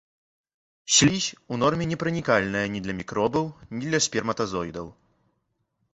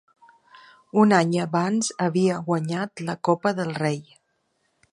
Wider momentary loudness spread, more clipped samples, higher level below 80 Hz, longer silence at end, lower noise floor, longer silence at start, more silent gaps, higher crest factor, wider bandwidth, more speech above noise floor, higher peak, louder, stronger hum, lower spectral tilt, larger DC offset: first, 15 LU vs 10 LU; neither; first, -54 dBFS vs -70 dBFS; about the same, 1 s vs 0.9 s; first, -75 dBFS vs -71 dBFS; about the same, 0.85 s vs 0.95 s; neither; about the same, 22 dB vs 22 dB; second, 8.4 kHz vs 11.5 kHz; about the same, 50 dB vs 49 dB; second, -6 dBFS vs -2 dBFS; about the same, -24 LUFS vs -23 LUFS; neither; second, -3.5 dB/octave vs -5.5 dB/octave; neither